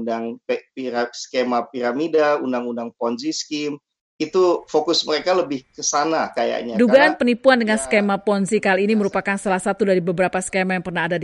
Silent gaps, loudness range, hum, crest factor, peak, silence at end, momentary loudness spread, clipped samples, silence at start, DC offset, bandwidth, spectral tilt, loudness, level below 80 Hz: 4.01-4.19 s; 5 LU; none; 18 dB; -2 dBFS; 0 s; 10 LU; under 0.1%; 0 s; under 0.1%; 11.5 kHz; -4 dB/octave; -20 LUFS; -58 dBFS